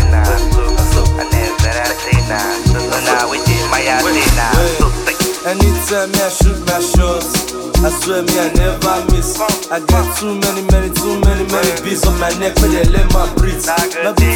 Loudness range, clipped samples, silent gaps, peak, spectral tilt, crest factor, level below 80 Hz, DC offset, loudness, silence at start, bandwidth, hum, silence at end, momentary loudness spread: 1 LU; under 0.1%; none; 0 dBFS; -4.5 dB/octave; 12 dB; -16 dBFS; under 0.1%; -14 LUFS; 0 s; 19 kHz; none; 0 s; 4 LU